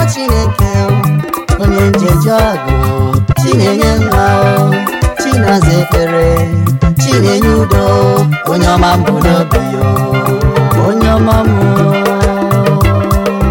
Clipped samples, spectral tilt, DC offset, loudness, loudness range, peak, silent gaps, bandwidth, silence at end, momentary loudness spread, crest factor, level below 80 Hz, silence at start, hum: under 0.1%; -6.5 dB/octave; under 0.1%; -10 LUFS; 1 LU; 0 dBFS; none; 17 kHz; 0 s; 3 LU; 8 dB; -20 dBFS; 0 s; none